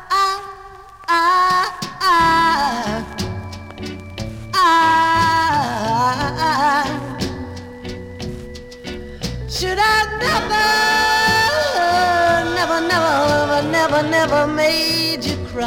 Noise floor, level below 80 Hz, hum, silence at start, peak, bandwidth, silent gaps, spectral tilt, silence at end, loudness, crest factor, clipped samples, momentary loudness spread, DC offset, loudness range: -38 dBFS; -40 dBFS; none; 0 s; -4 dBFS; over 20 kHz; none; -3.5 dB/octave; 0 s; -16 LUFS; 14 dB; under 0.1%; 17 LU; under 0.1%; 6 LU